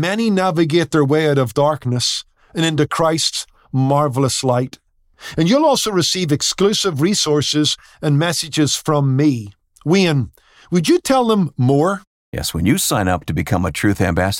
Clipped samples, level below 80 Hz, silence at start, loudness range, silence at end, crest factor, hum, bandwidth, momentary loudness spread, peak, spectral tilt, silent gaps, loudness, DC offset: under 0.1%; -46 dBFS; 0 s; 2 LU; 0 s; 14 dB; none; 17 kHz; 9 LU; -4 dBFS; -4.5 dB/octave; 12.07-12.32 s; -17 LUFS; under 0.1%